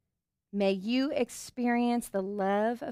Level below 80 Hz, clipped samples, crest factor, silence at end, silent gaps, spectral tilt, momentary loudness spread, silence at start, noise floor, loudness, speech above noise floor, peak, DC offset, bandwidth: -68 dBFS; under 0.1%; 14 dB; 0 s; none; -5 dB/octave; 6 LU; 0.55 s; -86 dBFS; -30 LUFS; 56 dB; -16 dBFS; under 0.1%; 15.5 kHz